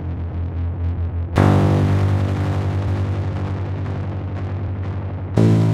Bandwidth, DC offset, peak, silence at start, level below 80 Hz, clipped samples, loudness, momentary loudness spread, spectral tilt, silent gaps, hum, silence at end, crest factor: 8.6 kHz; under 0.1%; 0 dBFS; 0 s; -34 dBFS; under 0.1%; -21 LUFS; 10 LU; -8.5 dB/octave; none; none; 0 s; 18 dB